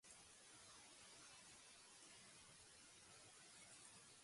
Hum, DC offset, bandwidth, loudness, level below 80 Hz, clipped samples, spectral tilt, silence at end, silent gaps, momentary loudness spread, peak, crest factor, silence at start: none; under 0.1%; 11.5 kHz; -63 LUFS; -88 dBFS; under 0.1%; -1 dB/octave; 0 s; none; 2 LU; -50 dBFS; 16 dB; 0.05 s